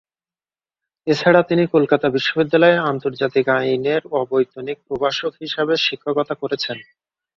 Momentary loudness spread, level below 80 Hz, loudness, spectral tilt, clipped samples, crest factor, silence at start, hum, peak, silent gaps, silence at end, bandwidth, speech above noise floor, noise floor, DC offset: 10 LU; -60 dBFS; -18 LUFS; -6 dB/octave; under 0.1%; 18 dB; 1.05 s; none; -2 dBFS; none; 0.55 s; 7.4 kHz; over 72 dB; under -90 dBFS; under 0.1%